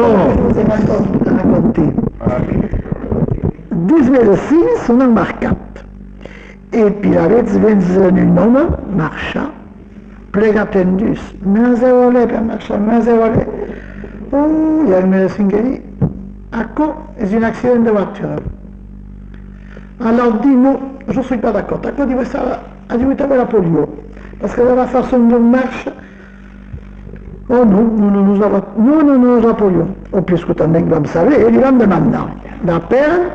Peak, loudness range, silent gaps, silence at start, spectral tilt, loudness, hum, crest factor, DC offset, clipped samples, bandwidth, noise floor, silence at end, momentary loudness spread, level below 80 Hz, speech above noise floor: -2 dBFS; 4 LU; none; 0 s; -9 dB/octave; -13 LUFS; none; 10 dB; under 0.1%; under 0.1%; 7.6 kHz; -35 dBFS; 0 s; 13 LU; -32 dBFS; 23 dB